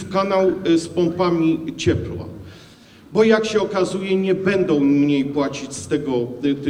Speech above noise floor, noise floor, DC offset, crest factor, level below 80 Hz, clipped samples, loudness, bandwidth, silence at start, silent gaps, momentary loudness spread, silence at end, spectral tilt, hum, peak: 27 dB; -45 dBFS; under 0.1%; 18 dB; -48 dBFS; under 0.1%; -19 LUFS; 11 kHz; 0 s; none; 8 LU; 0 s; -6 dB/octave; none; -2 dBFS